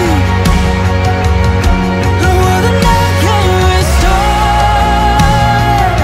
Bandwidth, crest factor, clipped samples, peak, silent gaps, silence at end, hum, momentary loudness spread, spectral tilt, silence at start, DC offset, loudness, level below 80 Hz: 16 kHz; 10 dB; under 0.1%; 0 dBFS; none; 0 s; none; 2 LU; -5.5 dB/octave; 0 s; under 0.1%; -10 LUFS; -14 dBFS